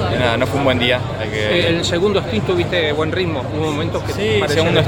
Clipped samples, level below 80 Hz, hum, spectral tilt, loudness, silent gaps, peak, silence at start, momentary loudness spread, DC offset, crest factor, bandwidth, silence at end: under 0.1%; -36 dBFS; none; -5.5 dB/octave; -17 LUFS; none; -2 dBFS; 0 s; 5 LU; under 0.1%; 16 dB; 17.5 kHz; 0 s